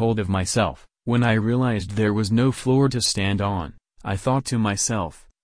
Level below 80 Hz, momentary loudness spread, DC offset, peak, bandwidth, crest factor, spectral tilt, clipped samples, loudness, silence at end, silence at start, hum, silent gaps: -46 dBFS; 10 LU; under 0.1%; -8 dBFS; 10.5 kHz; 14 dB; -5 dB/octave; under 0.1%; -22 LUFS; 0.3 s; 0 s; none; none